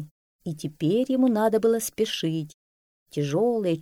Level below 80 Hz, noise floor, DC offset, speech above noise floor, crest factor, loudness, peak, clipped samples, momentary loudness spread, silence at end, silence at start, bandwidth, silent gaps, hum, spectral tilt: -66 dBFS; under -90 dBFS; under 0.1%; over 66 dB; 14 dB; -25 LUFS; -10 dBFS; under 0.1%; 15 LU; 0 s; 0 s; 17 kHz; 0.11-0.39 s, 2.54-3.06 s; none; -5.5 dB/octave